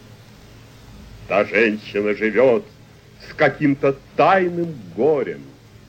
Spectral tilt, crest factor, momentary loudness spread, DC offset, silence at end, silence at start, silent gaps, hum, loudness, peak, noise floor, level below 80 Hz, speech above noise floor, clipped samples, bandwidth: -7 dB/octave; 16 dB; 11 LU; under 0.1%; 0.35 s; 0.95 s; none; none; -19 LUFS; -4 dBFS; -44 dBFS; -52 dBFS; 25 dB; under 0.1%; 16 kHz